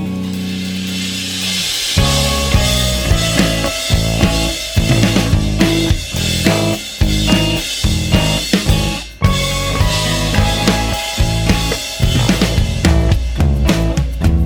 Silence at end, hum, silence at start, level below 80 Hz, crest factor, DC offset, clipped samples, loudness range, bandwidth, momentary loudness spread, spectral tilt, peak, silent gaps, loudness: 0 s; none; 0 s; -20 dBFS; 14 dB; under 0.1%; under 0.1%; 1 LU; 19 kHz; 5 LU; -4.5 dB/octave; 0 dBFS; none; -15 LUFS